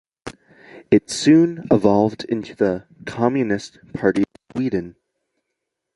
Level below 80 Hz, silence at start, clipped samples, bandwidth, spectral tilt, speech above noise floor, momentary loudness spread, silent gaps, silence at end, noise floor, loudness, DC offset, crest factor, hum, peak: -54 dBFS; 0.25 s; under 0.1%; 11.5 kHz; -6 dB/octave; 61 dB; 18 LU; none; 1.05 s; -79 dBFS; -19 LUFS; under 0.1%; 18 dB; none; -2 dBFS